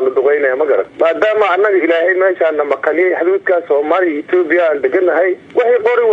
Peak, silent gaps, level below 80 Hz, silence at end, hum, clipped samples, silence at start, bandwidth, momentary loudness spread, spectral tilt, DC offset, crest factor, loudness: 0 dBFS; none; -66 dBFS; 0 s; none; under 0.1%; 0 s; 6 kHz; 3 LU; -5.5 dB/octave; under 0.1%; 12 dB; -13 LUFS